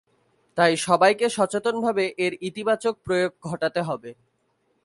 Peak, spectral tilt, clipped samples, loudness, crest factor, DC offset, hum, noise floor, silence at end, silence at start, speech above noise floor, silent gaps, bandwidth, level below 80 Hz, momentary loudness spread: -4 dBFS; -4.5 dB/octave; under 0.1%; -23 LUFS; 20 dB; under 0.1%; none; -70 dBFS; 0.7 s; 0.55 s; 47 dB; none; 11.5 kHz; -64 dBFS; 10 LU